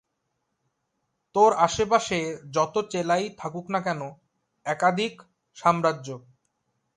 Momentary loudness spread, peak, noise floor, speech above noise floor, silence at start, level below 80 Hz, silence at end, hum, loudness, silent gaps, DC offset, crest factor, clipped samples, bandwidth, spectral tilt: 15 LU; -6 dBFS; -78 dBFS; 53 dB; 1.35 s; -60 dBFS; 0.8 s; none; -25 LUFS; none; under 0.1%; 22 dB; under 0.1%; 11.5 kHz; -4.5 dB/octave